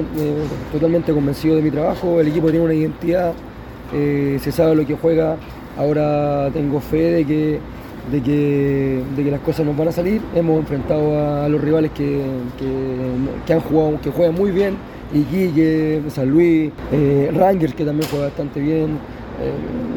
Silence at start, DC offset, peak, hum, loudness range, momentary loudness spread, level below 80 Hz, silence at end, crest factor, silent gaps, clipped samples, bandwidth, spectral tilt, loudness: 0 s; under 0.1%; -2 dBFS; none; 2 LU; 8 LU; -38 dBFS; 0 s; 16 dB; none; under 0.1%; 19 kHz; -8.5 dB/octave; -18 LUFS